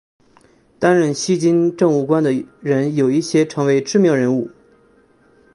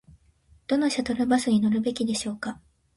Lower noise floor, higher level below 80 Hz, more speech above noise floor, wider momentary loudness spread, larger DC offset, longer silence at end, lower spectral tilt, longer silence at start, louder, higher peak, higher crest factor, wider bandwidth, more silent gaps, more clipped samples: second, -53 dBFS vs -60 dBFS; about the same, -62 dBFS vs -58 dBFS; about the same, 38 dB vs 35 dB; second, 5 LU vs 14 LU; neither; first, 1.05 s vs 0.45 s; first, -6 dB/octave vs -4.5 dB/octave; about the same, 0.8 s vs 0.7 s; first, -17 LUFS vs -25 LUFS; first, -2 dBFS vs -10 dBFS; about the same, 16 dB vs 16 dB; about the same, 11.5 kHz vs 11.5 kHz; neither; neither